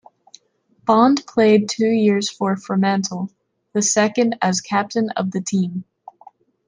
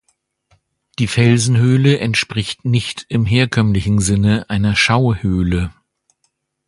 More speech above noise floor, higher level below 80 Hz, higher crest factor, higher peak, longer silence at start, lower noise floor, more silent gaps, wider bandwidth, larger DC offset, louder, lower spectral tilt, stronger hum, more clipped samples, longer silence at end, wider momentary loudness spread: second, 42 dB vs 53 dB; second, -68 dBFS vs -34 dBFS; about the same, 16 dB vs 16 dB; second, -4 dBFS vs 0 dBFS; second, 0.85 s vs 1 s; second, -60 dBFS vs -68 dBFS; neither; second, 10 kHz vs 11.5 kHz; neither; second, -19 LUFS vs -15 LUFS; about the same, -4.5 dB/octave vs -5.5 dB/octave; neither; neither; about the same, 0.85 s vs 0.95 s; first, 11 LU vs 8 LU